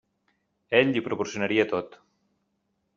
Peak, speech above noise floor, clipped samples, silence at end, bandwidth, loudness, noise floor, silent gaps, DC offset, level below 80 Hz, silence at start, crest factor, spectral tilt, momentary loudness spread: -4 dBFS; 50 dB; under 0.1%; 1 s; 7.6 kHz; -25 LUFS; -75 dBFS; none; under 0.1%; -68 dBFS; 0.7 s; 24 dB; -3.5 dB/octave; 9 LU